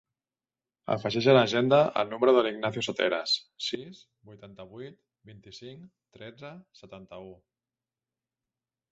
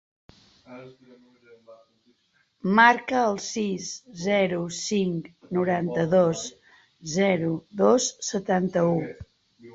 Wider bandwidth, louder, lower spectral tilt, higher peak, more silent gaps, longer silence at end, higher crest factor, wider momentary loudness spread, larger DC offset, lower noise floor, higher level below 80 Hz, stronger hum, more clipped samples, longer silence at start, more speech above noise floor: about the same, 8 kHz vs 8 kHz; about the same, -25 LUFS vs -24 LUFS; about the same, -5.5 dB/octave vs -4.5 dB/octave; second, -8 dBFS vs -2 dBFS; neither; first, 1.6 s vs 0.05 s; about the same, 22 dB vs 24 dB; first, 25 LU vs 17 LU; neither; first, under -90 dBFS vs -68 dBFS; second, -70 dBFS vs -62 dBFS; neither; neither; first, 0.9 s vs 0.7 s; first, over 62 dB vs 43 dB